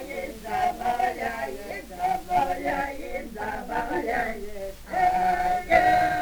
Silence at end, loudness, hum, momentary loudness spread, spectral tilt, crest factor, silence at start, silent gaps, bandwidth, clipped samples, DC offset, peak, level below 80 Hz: 0 s; -26 LUFS; none; 14 LU; -4.5 dB/octave; 20 dB; 0 s; none; over 20 kHz; under 0.1%; under 0.1%; -6 dBFS; -44 dBFS